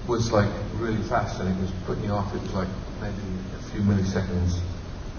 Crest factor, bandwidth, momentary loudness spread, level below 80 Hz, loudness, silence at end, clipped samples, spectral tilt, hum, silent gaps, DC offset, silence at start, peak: 18 dB; 6.8 kHz; 10 LU; -36 dBFS; -27 LUFS; 0 s; under 0.1%; -7 dB/octave; none; none; under 0.1%; 0 s; -8 dBFS